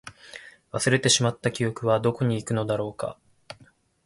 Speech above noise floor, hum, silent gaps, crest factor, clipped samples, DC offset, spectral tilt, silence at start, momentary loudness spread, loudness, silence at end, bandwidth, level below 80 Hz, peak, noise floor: 33 dB; none; none; 20 dB; under 0.1%; under 0.1%; -4 dB/octave; 0.05 s; 24 LU; -25 LUFS; 0.55 s; 11.5 kHz; -58 dBFS; -8 dBFS; -58 dBFS